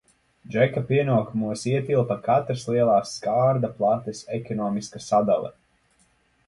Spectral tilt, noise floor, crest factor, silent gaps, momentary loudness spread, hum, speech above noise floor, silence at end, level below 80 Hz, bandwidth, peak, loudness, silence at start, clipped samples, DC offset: -6.5 dB/octave; -64 dBFS; 18 dB; none; 9 LU; none; 41 dB; 0.95 s; -60 dBFS; 11.5 kHz; -6 dBFS; -24 LUFS; 0.5 s; under 0.1%; under 0.1%